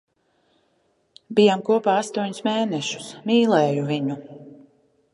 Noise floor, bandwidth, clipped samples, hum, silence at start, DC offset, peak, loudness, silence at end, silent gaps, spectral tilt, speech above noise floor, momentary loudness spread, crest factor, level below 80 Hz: -66 dBFS; 11.5 kHz; under 0.1%; none; 1.3 s; under 0.1%; -4 dBFS; -21 LUFS; 0.6 s; none; -5.5 dB/octave; 46 dB; 11 LU; 20 dB; -72 dBFS